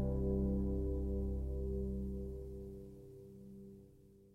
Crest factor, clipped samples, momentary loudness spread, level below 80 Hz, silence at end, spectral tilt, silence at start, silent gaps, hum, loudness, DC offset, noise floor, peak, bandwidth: 14 dB; under 0.1%; 19 LU; -44 dBFS; 0.05 s; -11.5 dB/octave; 0 s; none; 50 Hz at -65 dBFS; -40 LUFS; under 0.1%; -62 dBFS; -26 dBFS; 1.6 kHz